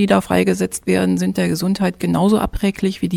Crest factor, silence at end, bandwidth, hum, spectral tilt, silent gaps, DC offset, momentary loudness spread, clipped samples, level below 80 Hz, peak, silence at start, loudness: 16 dB; 0 s; 15.5 kHz; none; -6 dB/octave; none; under 0.1%; 4 LU; under 0.1%; -36 dBFS; -2 dBFS; 0 s; -18 LUFS